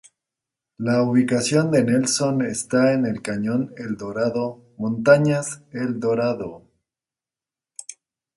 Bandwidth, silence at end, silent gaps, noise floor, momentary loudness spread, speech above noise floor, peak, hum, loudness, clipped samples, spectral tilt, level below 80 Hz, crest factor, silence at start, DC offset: 11.5 kHz; 0.45 s; none; under -90 dBFS; 13 LU; over 69 dB; -2 dBFS; none; -21 LUFS; under 0.1%; -5.5 dB/octave; -62 dBFS; 20 dB; 0.8 s; under 0.1%